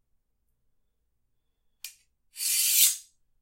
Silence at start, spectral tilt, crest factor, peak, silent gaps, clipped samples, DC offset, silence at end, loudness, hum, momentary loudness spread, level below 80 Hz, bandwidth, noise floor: 1.85 s; 7.5 dB/octave; 24 dB; -6 dBFS; none; under 0.1%; under 0.1%; 0.4 s; -22 LUFS; none; 25 LU; -78 dBFS; 16 kHz; -74 dBFS